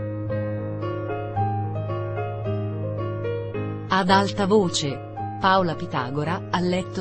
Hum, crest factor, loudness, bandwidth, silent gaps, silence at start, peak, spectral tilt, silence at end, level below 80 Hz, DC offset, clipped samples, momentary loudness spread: none; 20 dB; -25 LUFS; 8.8 kHz; none; 0 s; -4 dBFS; -5.5 dB/octave; 0 s; -50 dBFS; under 0.1%; under 0.1%; 9 LU